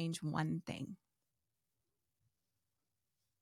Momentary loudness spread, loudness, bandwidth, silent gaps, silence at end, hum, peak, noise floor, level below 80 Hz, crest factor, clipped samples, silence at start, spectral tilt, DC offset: 12 LU; -42 LUFS; 13.5 kHz; none; 2.45 s; none; -26 dBFS; -90 dBFS; -76 dBFS; 20 dB; under 0.1%; 0 s; -6 dB/octave; under 0.1%